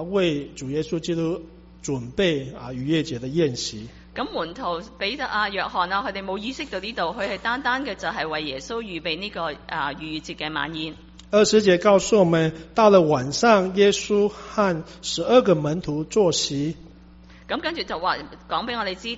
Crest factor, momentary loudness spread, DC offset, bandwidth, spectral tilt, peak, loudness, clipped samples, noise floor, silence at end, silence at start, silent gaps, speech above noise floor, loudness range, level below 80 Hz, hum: 20 dB; 13 LU; under 0.1%; 8 kHz; -3.5 dB/octave; -4 dBFS; -23 LUFS; under 0.1%; -47 dBFS; 0 s; 0 s; none; 24 dB; 8 LU; -50 dBFS; none